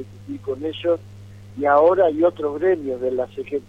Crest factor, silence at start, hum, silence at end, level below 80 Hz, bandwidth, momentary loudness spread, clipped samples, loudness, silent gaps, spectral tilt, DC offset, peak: 16 dB; 0 s; none; 0.1 s; -56 dBFS; 7.6 kHz; 14 LU; under 0.1%; -20 LUFS; none; -7.5 dB/octave; under 0.1%; -4 dBFS